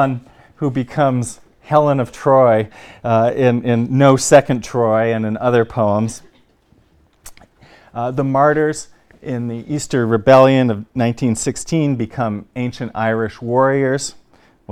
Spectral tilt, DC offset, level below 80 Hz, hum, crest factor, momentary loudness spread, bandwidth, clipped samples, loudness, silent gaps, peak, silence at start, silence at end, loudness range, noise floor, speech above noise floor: -6 dB/octave; under 0.1%; -50 dBFS; none; 16 dB; 13 LU; 14.5 kHz; under 0.1%; -16 LUFS; none; 0 dBFS; 0 s; 0 s; 7 LU; -54 dBFS; 39 dB